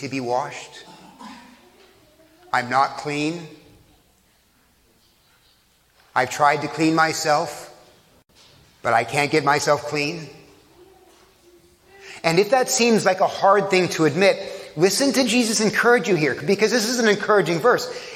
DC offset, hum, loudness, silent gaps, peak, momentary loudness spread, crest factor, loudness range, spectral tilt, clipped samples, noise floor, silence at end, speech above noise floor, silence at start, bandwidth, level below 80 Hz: under 0.1%; none; -20 LUFS; none; -2 dBFS; 15 LU; 20 dB; 9 LU; -3.5 dB/octave; under 0.1%; -60 dBFS; 0 s; 40 dB; 0 s; 16.5 kHz; -64 dBFS